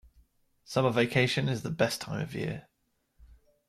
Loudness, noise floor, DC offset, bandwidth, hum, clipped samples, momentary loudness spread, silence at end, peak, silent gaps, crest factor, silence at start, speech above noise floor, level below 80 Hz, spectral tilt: -29 LUFS; -76 dBFS; under 0.1%; 15.5 kHz; none; under 0.1%; 10 LU; 0.45 s; -12 dBFS; none; 20 dB; 0.7 s; 47 dB; -60 dBFS; -5.5 dB/octave